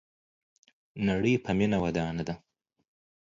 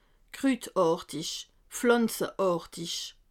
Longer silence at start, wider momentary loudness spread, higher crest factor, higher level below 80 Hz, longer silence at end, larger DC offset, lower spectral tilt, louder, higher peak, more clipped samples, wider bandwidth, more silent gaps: first, 0.95 s vs 0.35 s; first, 13 LU vs 10 LU; about the same, 18 dB vs 18 dB; first, -54 dBFS vs -64 dBFS; first, 0.85 s vs 0.2 s; neither; first, -7 dB/octave vs -4 dB/octave; about the same, -29 LUFS vs -29 LUFS; second, -14 dBFS vs -10 dBFS; neither; second, 7.6 kHz vs 17.5 kHz; neither